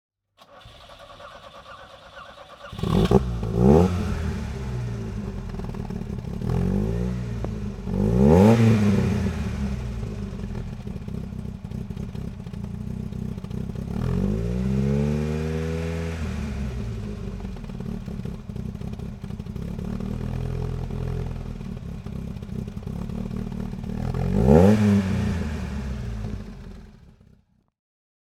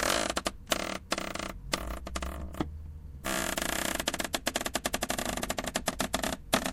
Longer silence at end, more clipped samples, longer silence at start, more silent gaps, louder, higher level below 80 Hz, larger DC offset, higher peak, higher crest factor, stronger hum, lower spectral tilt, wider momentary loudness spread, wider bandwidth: first, 1.2 s vs 0 s; neither; first, 0.5 s vs 0 s; neither; first, -25 LUFS vs -33 LUFS; first, -34 dBFS vs -44 dBFS; neither; first, -2 dBFS vs -8 dBFS; about the same, 24 dB vs 24 dB; neither; first, -8 dB/octave vs -2.5 dB/octave; first, 17 LU vs 8 LU; second, 13.5 kHz vs 17 kHz